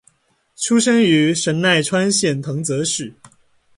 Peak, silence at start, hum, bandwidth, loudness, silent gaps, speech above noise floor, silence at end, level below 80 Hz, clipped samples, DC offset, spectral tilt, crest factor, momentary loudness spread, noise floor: -4 dBFS; 0.6 s; none; 11.5 kHz; -17 LUFS; none; 44 dB; 0.65 s; -60 dBFS; under 0.1%; under 0.1%; -4 dB/octave; 14 dB; 9 LU; -61 dBFS